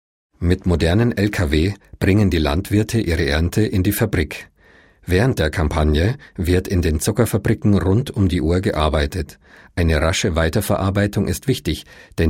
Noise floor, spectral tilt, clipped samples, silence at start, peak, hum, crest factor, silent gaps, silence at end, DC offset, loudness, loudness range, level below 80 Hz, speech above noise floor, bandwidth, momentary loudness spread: -51 dBFS; -6 dB/octave; under 0.1%; 0.4 s; -2 dBFS; none; 16 dB; none; 0 s; 0.2%; -19 LUFS; 2 LU; -28 dBFS; 33 dB; 16.5 kHz; 7 LU